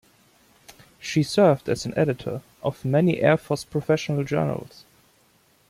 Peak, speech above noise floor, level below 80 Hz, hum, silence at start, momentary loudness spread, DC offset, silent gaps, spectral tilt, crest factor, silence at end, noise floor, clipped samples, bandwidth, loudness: -6 dBFS; 38 dB; -58 dBFS; none; 0.7 s; 12 LU; under 0.1%; none; -6.5 dB/octave; 20 dB; 1.05 s; -61 dBFS; under 0.1%; 15.5 kHz; -23 LUFS